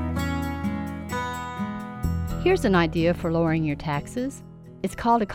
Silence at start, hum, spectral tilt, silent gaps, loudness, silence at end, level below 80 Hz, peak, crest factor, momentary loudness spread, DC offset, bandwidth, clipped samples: 0 s; none; -6.5 dB/octave; none; -26 LUFS; 0 s; -38 dBFS; -8 dBFS; 16 dB; 11 LU; under 0.1%; 16.5 kHz; under 0.1%